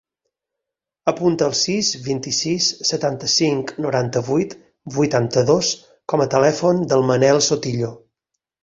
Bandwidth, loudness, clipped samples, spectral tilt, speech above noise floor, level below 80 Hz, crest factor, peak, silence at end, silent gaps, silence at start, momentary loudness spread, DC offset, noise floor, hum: 7.8 kHz; -19 LUFS; under 0.1%; -4 dB/octave; 66 dB; -56 dBFS; 18 dB; -2 dBFS; 0.65 s; none; 1.05 s; 8 LU; under 0.1%; -84 dBFS; none